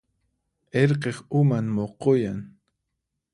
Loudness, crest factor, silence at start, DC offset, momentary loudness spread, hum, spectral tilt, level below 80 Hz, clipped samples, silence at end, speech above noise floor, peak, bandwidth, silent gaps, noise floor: -24 LUFS; 20 dB; 0.75 s; under 0.1%; 8 LU; none; -8 dB/octave; -60 dBFS; under 0.1%; 0.85 s; 58 dB; -6 dBFS; 11.5 kHz; none; -81 dBFS